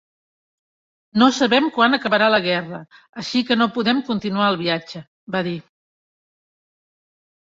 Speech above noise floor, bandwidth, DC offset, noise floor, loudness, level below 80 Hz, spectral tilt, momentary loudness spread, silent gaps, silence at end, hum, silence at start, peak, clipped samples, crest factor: over 71 dB; 7.8 kHz; under 0.1%; under -90 dBFS; -19 LUFS; -62 dBFS; -5 dB/octave; 17 LU; 3.09-3.13 s, 5.07-5.27 s; 1.95 s; none; 1.15 s; -2 dBFS; under 0.1%; 20 dB